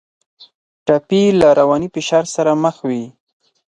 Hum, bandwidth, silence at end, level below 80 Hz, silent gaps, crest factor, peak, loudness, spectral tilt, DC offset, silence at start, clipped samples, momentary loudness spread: none; 11 kHz; 0.7 s; -52 dBFS; 0.55-0.86 s; 16 dB; 0 dBFS; -15 LUFS; -5.5 dB/octave; under 0.1%; 0.4 s; under 0.1%; 13 LU